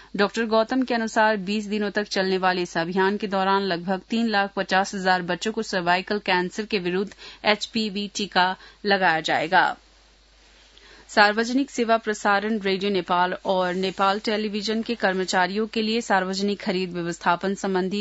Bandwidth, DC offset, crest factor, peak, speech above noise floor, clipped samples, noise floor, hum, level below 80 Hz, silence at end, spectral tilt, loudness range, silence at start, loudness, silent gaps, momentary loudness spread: 8 kHz; under 0.1%; 22 dB; -2 dBFS; 32 dB; under 0.1%; -55 dBFS; none; -58 dBFS; 0 s; -4.5 dB/octave; 1 LU; 0 s; -23 LUFS; none; 6 LU